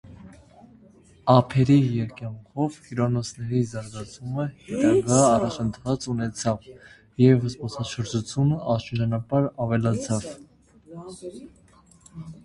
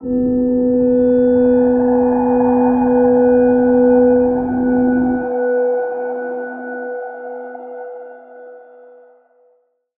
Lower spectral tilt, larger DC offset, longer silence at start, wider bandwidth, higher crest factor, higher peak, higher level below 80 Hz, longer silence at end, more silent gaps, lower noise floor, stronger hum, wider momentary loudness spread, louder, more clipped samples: second, -6.5 dB/octave vs -13 dB/octave; neither; about the same, 0.05 s vs 0 s; first, 11.5 kHz vs 2.6 kHz; first, 22 dB vs 12 dB; about the same, -4 dBFS vs -4 dBFS; second, -52 dBFS vs -44 dBFS; second, 0.1 s vs 1.4 s; neither; second, -54 dBFS vs -59 dBFS; neither; first, 20 LU vs 17 LU; second, -24 LUFS vs -14 LUFS; neither